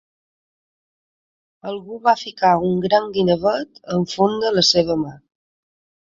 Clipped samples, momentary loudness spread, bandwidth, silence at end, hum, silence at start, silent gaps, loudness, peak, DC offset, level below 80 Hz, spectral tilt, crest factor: under 0.1%; 15 LU; 7.8 kHz; 1 s; none; 1.65 s; none; -18 LUFS; -2 dBFS; under 0.1%; -56 dBFS; -4.5 dB/octave; 18 dB